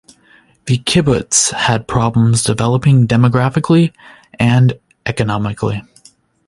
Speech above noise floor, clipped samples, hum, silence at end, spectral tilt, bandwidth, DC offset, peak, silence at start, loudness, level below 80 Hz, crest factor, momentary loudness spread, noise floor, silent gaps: 37 dB; under 0.1%; none; 0.65 s; -5 dB/octave; 11.5 kHz; under 0.1%; 0 dBFS; 0.65 s; -14 LUFS; -40 dBFS; 14 dB; 9 LU; -50 dBFS; none